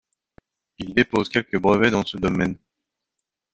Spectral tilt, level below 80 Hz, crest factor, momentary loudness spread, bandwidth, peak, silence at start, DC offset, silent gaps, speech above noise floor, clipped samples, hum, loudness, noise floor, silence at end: -6 dB/octave; -52 dBFS; 22 dB; 9 LU; 8.6 kHz; -2 dBFS; 0.8 s; under 0.1%; none; 63 dB; under 0.1%; none; -21 LUFS; -84 dBFS; 1 s